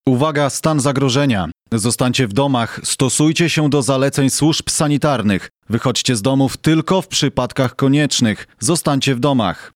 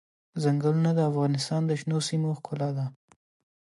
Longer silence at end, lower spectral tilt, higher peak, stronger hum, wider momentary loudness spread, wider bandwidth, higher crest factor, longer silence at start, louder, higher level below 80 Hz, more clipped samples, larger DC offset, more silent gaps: second, 0.05 s vs 0.75 s; second, -4.5 dB/octave vs -6.5 dB/octave; first, 0 dBFS vs -14 dBFS; neither; about the same, 5 LU vs 7 LU; first, 16 kHz vs 11.5 kHz; about the same, 16 dB vs 14 dB; second, 0.05 s vs 0.35 s; first, -16 LUFS vs -27 LUFS; first, -46 dBFS vs -72 dBFS; neither; neither; neither